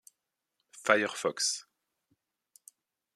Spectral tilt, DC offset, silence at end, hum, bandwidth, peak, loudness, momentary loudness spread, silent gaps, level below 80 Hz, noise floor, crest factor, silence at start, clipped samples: -1.5 dB/octave; under 0.1%; 1.55 s; none; 14 kHz; -6 dBFS; -30 LUFS; 9 LU; none; -84 dBFS; -84 dBFS; 30 dB; 0.75 s; under 0.1%